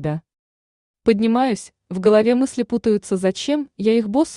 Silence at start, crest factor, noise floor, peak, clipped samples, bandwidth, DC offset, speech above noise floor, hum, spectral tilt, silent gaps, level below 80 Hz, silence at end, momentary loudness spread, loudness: 0 s; 16 dB; under -90 dBFS; -4 dBFS; under 0.1%; 11 kHz; under 0.1%; over 72 dB; none; -6 dB/octave; 0.39-0.94 s; -54 dBFS; 0 s; 10 LU; -19 LUFS